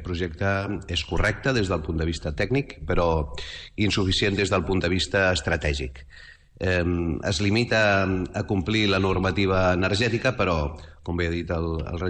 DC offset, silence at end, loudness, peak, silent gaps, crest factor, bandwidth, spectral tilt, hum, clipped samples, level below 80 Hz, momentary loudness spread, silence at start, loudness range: under 0.1%; 0 s; -24 LUFS; -10 dBFS; none; 14 dB; 9.6 kHz; -5.5 dB/octave; none; under 0.1%; -36 dBFS; 7 LU; 0 s; 3 LU